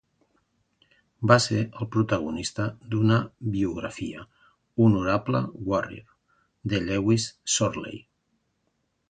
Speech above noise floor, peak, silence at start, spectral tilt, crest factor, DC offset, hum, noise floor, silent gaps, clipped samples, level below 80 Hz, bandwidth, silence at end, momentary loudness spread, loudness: 49 dB; -4 dBFS; 1.2 s; -5 dB/octave; 24 dB; under 0.1%; none; -74 dBFS; none; under 0.1%; -52 dBFS; 9.4 kHz; 1.1 s; 15 LU; -25 LUFS